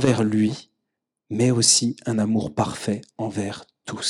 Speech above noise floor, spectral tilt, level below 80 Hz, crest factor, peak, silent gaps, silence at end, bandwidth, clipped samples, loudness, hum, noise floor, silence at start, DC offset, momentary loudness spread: 60 dB; -4 dB/octave; -58 dBFS; 20 dB; -4 dBFS; none; 0 s; 13.5 kHz; under 0.1%; -22 LUFS; none; -81 dBFS; 0 s; under 0.1%; 16 LU